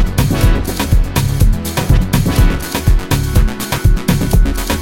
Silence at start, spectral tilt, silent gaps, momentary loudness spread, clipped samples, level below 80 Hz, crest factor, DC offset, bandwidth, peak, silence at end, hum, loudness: 0 s; -5.5 dB/octave; none; 3 LU; under 0.1%; -14 dBFS; 12 dB; under 0.1%; 17 kHz; 0 dBFS; 0 s; none; -15 LUFS